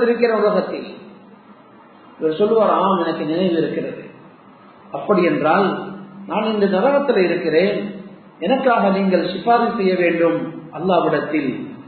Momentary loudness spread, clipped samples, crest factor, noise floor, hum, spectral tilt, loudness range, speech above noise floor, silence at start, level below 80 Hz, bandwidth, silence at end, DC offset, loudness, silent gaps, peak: 14 LU; under 0.1%; 16 dB; -45 dBFS; none; -11.5 dB/octave; 3 LU; 28 dB; 0 s; -64 dBFS; 4.5 kHz; 0 s; under 0.1%; -18 LUFS; none; -2 dBFS